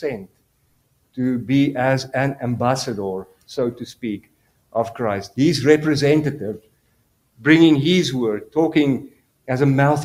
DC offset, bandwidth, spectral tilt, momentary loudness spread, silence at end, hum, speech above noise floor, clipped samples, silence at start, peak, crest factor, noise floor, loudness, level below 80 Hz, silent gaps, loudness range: under 0.1%; 15 kHz; -6 dB/octave; 14 LU; 0 s; none; 45 dB; under 0.1%; 0 s; 0 dBFS; 20 dB; -63 dBFS; -19 LUFS; -56 dBFS; none; 6 LU